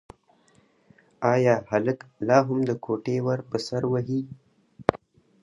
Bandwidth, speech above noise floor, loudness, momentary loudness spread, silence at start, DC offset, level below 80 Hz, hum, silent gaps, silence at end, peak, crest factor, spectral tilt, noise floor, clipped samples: 11.5 kHz; 37 dB; -25 LUFS; 9 LU; 1.2 s; under 0.1%; -60 dBFS; none; none; 0.45 s; 0 dBFS; 26 dB; -7 dB/octave; -62 dBFS; under 0.1%